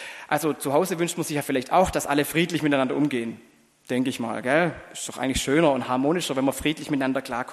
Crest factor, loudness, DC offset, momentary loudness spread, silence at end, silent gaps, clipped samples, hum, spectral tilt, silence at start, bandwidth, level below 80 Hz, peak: 18 dB; -24 LUFS; under 0.1%; 7 LU; 0 s; none; under 0.1%; none; -4.5 dB/octave; 0 s; 13 kHz; -50 dBFS; -6 dBFS